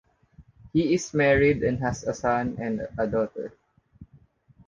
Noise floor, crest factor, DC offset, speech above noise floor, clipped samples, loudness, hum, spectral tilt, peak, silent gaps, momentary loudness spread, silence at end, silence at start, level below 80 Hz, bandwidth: -58 dBFS; 18 dB; under 0.1%; 33 dB; under 0.1%; -25 LUFS; none; -6 dB/octave; -10 dBFS; none; 10 LU; 0.65 s; 0.4 s; -48 dBFS; 9.8 kHz